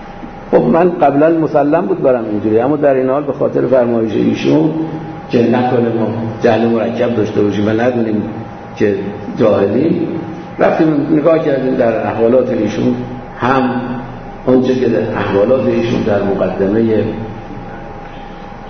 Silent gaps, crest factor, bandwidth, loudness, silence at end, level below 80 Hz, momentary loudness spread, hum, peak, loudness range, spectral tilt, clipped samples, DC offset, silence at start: none; 14 dB; 6.4 kHz; -13 LUFS; 0 s; -40 dBFS; 14 LU; none; 0 dBFS; 3 LU; -8 dB/octave; under 0.1%; under 0.1%; 0 s